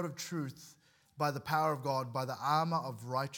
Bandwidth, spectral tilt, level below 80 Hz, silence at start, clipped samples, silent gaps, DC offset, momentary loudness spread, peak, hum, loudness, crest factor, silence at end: 18 kHz; -5.5 dB/octave; -78 dBFS; 0 s; under 0.1%; none; under 0.1%; 8 LU; -18 dBFS; none; -35 LUFS; 18 dB; 0 s